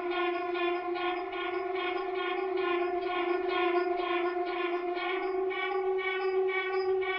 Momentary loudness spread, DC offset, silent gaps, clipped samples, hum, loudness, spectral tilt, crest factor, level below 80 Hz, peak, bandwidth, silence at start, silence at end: 3 LU; under 0.1%; none; under 0.1%; none; -31 LUFS; -0.5 dB/octave; 14 dB; -68 dBFS; -18 dBFS; 5.6 kHz; 0 s; 0 s